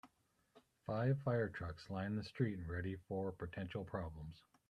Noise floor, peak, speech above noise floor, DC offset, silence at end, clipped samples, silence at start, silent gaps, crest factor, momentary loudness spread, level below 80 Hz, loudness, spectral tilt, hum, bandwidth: -78 dBFS; -24 dBFS; 36 dB; under 0.1%; 0.3 s; under 0.1%; 0.05 s; none; 20 dB; 11 LU; -64 dBFS; -43 LUFS; -8.5 dB/octave; none; 9.8 kHz